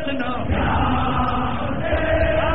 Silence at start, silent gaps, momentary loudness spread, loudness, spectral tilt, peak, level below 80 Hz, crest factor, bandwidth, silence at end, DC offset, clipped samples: 0 s; none; 5 LU; -21 LUFS; -5 dB/octave; -8 dBFS; -30 dBFS; 14 dB; 4.2 kHz; 0 s; 4%; under 0.1%